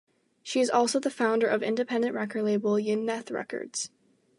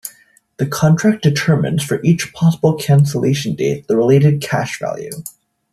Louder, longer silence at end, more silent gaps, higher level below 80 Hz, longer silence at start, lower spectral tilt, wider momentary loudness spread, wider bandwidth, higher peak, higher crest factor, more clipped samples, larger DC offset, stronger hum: second, -28 LUFS vs -15 LUFS; about the same, 0.5 s vs 0.4 s; neither; second, -82 dBFS vs -52 dBFS; first, 0.45 s vs 0.05 s; second, -4 dB/octave vs -6.5 dB/octave; about the same, 10 LU vs 11 LU; second, 11.5 kHz vs 14 kHz; second, -10 dBFS vs -2 dBFS; about the same, 18 dB vs 14 dB; neither; neither; neither